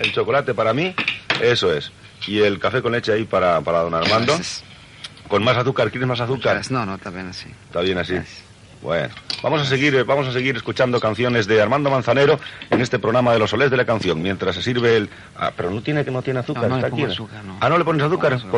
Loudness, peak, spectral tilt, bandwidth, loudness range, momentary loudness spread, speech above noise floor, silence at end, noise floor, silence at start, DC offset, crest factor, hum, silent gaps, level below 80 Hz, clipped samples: -19 LUFS; -6 dBFS; -5.5 dB/octave; 11.5 kHz; 4 LU; 11 LU; 20 dB; 0 s; -39 dBFS; 0 s; under 0.1%; 14 dB; none; none; -54 dBFS; under 0.1%